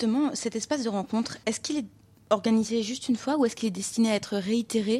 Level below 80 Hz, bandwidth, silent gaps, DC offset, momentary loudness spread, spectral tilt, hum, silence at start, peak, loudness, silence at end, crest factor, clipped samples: -66 dBFS; 13 kHz; none; under 0.1%; 6 LU; -4.5 dB/octave; none; 0 s; -8 dBFS; -28 LUFS; 0 s; 18 dB; under 0.1%